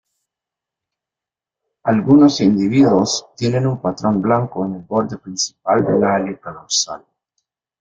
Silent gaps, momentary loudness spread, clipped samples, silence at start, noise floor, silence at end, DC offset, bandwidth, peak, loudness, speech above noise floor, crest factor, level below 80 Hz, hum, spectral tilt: none; 12 LU; under 0.1%; 1.85 s; -87 dBFS; 0.85 s; under 0.1%; 7.8 kHz; -2 dBFS; -17 LUFS; 71 dB; 16 dB; -54 dBFS; none; -5 dB/octave